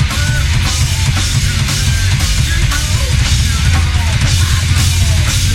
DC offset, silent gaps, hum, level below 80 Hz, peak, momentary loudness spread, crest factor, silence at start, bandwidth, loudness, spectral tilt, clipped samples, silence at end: under 0.1%; none; none; -16 dBFS; 0 dBFS; 2 LU; 12 dB; 0 s; 16.5 kHz; -13 LUFS; -3.5 dB/octave; under 0.1%; 0 s